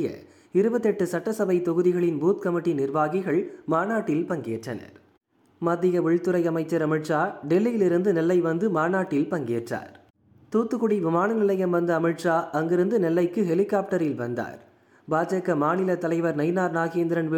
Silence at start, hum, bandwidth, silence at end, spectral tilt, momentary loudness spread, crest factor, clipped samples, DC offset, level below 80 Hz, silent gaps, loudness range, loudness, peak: 0 s; none; 14.5 kHz; 0 s; -7.5 dB/octave; 7 LU; 14 dB; under 0.1%; under 0.1%; -70 dBFS; 10.10-10.14 s; 3 LU; -24 LUFS; -10 dBFS